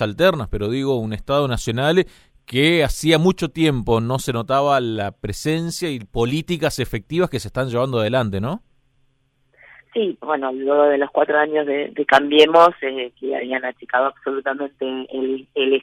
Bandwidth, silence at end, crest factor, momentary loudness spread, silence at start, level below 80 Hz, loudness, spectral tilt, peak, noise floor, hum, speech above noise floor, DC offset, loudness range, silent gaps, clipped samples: 16 kHz; 0 s; 18 dB; 10 LU; 0 s; -40 dBFS; -20 LUFS; -5.5 dB/octave; -2 dBFS; -63 dBFS; none; 44 dB; under 0.1%; 7 LU; none; under 0.1%